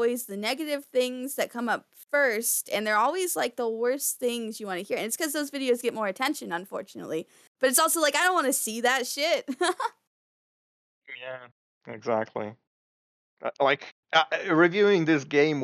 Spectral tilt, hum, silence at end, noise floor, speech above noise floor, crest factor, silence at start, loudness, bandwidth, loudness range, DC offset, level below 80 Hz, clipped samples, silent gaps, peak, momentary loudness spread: -2.5 dB/octave; none; 0 s; under -90 dBFS; over 63 dB; 20 dB; 0 s; -26 LUFS; 16 kHz; 8 LU; under 0.1%; -84 dBFS; under 0.1%; 7.47-7.55 s, 10.07-11.02 s, 11.52-11.81 s, 12.67-13.37 s, 13.92-14.03 s; -8 dBFS; 14 LU